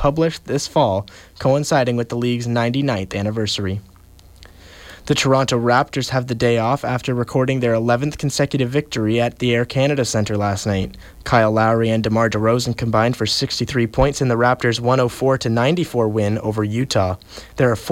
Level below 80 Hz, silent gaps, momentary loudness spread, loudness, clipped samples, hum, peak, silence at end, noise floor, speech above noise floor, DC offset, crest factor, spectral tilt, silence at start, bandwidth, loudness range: -42 dBFS; none; 6 LU; -19 LUFS; under 0.1%; none; -4 dBFS; 0 s; -45 dBFS; 27 dB; under 0.1%; 14 dB; -5.5 dB/octave; 0 s; 16 kHz; 3 LU